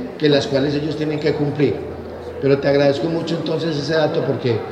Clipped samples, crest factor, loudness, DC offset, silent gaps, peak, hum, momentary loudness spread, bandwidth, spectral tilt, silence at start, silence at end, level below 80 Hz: under 0.1%; 16 dB; -19 LUFS; under 0.1%; none; -2 dBFS; none; 7 LU; 9.6 kHz; -7 dB/octave; 0 s; 0 s; -48 dBFS